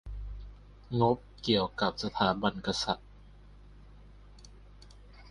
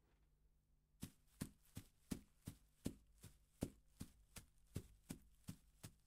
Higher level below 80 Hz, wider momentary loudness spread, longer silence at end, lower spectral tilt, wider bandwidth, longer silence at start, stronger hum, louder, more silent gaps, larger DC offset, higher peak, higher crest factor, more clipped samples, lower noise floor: first, -50 dBFS vs -68 dBFS; first, 16 LU vs 10 LU; about the same, 0 s vs 0.1 s; about the same, -5.5 dB/octave vs -5.5 dB/octave; second, 11 kHz vs 16 kHz; second, 0.05 s vs 0.2 s; first, 50 Hz at -50 dBFS vs none; first, -31 LUFS vs -58 LUFS; neither; neither; first, -10 dBFS vs -28 dBFS; second, 24 dB vs 30 dB; neither; second, -53 dBFS vs -78 dBFS